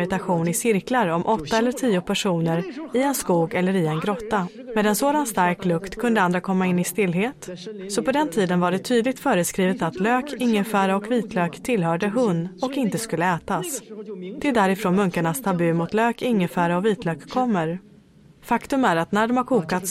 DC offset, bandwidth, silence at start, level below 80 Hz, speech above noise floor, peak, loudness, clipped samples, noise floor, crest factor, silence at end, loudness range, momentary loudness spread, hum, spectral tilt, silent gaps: under 0.1%; 16 kHz; 0 s; -56 dBFS; 29 dB; -6 dBFS; -22 LUFS; under 0.1%; -51 dBFS; 16 dB; 0 s; 2 LU; 6 LU; none; -5.5 dB/octave; none